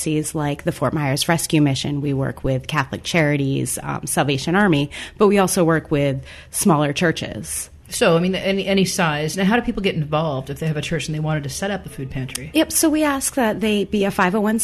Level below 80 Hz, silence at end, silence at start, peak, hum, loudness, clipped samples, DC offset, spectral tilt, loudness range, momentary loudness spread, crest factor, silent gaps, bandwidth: -42 dBFS; 0 s; 0 s; -4 dBFS; none; -20 LUFS; under 0.1%; under 0.1%; -4.5 dB/octave; 3 LU; 9 LU; 16 dB; none; 13.5 kHz